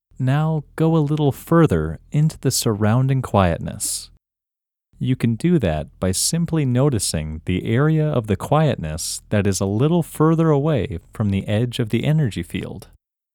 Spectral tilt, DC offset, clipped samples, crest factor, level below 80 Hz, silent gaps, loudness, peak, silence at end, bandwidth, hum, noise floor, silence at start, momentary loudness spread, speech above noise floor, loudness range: -6 dB/octave; under 0.1%; under 0.1%; 20 dB; -42 dBFS; none; -20 LUFS; 0 dBFS; 0.55 s; 18.5 kHz; none; -87 dBFS; 0.2 s; 7 LU; 68 dB; 2 LU